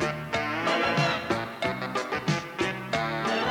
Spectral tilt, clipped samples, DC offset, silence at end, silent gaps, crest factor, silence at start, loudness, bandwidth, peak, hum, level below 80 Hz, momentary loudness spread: -5 dB/octave; under 0.1%; under 0.1%; 0 s; none; 16 dB; 0 s; -28 LUFS; 17.5 kHz; -12 dBFS; none; -56 dBFS; 6 LU